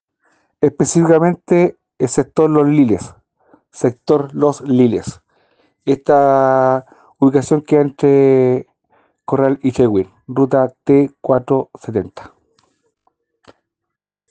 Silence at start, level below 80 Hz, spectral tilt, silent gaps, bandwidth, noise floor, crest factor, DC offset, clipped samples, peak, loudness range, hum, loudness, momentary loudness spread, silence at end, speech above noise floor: 0.6 s; -54 dBFS; -7 dB/octave; none; 9.6 kHz; -81 dBFS; 16 dB; under 0.1%; under 0.1%; 0 dBFS; 5 LU; none; -15 LUFS; 10 LU; 2.1 s; 67 dB